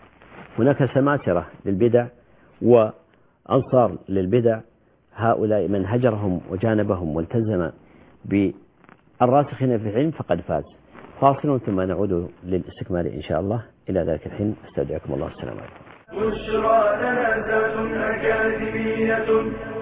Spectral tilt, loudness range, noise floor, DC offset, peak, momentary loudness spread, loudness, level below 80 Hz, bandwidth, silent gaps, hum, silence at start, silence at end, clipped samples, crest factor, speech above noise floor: -11.5 dB/octave; 5 LU; -53 dBFS; under 0.1%; -2 dBFS; 10 LU; -22 LUFS; -46 dBFS; 4 kHz; none; none; 0.3 s; 0 s; under 0.1%; 20 dB; 31 dB